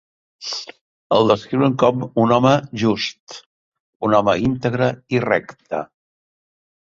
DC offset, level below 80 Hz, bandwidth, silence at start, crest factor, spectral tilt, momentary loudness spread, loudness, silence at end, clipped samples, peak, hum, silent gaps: under 0.1%; -52 dBFS; 7.6 kHz; 0.4 s; 18 dB; -6 dB/octave; 16 LU; -19 LUFS; 1 s; under 0.1%; -2 dBFS; none; 0.81-1.10 s, 3.20-3.27 s, 3.46-3.72 s, 3.80-4.00 s